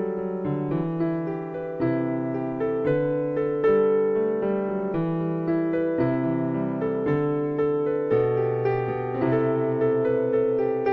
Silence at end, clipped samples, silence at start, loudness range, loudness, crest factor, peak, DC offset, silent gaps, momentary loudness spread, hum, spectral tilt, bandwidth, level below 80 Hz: 0 s; under 0.1%; 0 s; 2 LU; -25 LUFS; 14 dB; -10 dBFS; under 0.1%; none; 5 LU; none; -11 dB/octave; 5.2 kHz; -56 dBFS